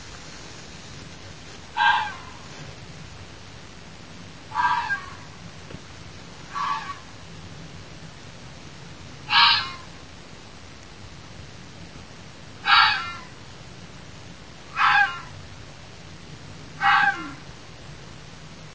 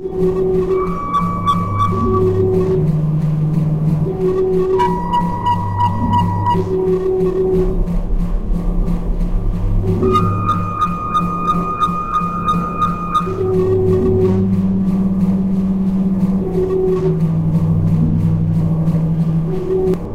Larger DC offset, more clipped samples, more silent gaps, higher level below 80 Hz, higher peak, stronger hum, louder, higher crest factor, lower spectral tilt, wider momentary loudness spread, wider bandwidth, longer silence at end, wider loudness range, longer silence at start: first, 0.5% vs under 0.1%; neither; neither; second, -52 dBFS vs -24 dBFS; about the same, -2 dBFS vs -2 dBFS; neither; second, -21 LUFS vs -16 LUFS; first, 24 dB vs 12 dB; second, -2 dB/octave vs -9.5 dB/octave; first, 24 LU vs 4 LU; second, 8 kHz vs 9.2 kHz; about the same, 0 s vs 0 s; first, 10 LU vs 2 LU; about the same, 0 s vs 0 s